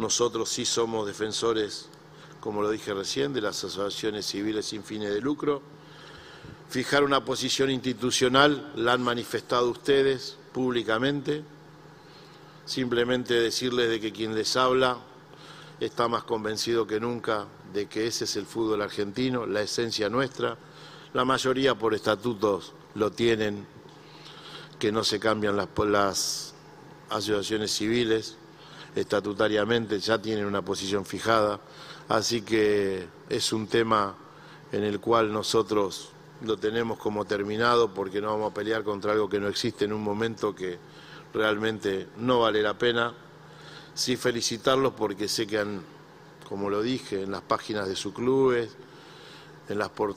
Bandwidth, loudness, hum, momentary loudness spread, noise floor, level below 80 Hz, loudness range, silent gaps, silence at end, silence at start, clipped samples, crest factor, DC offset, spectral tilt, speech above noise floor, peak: 16 kHz; -27 LUFS; none; 16 LU; -50 dBFS; -60 dBFS; 4 LU; none; 0 s; 0 s; under 0.1%; 24 dB; under 0.1%; -4 dB/octave; 23 dB; -4 dBFS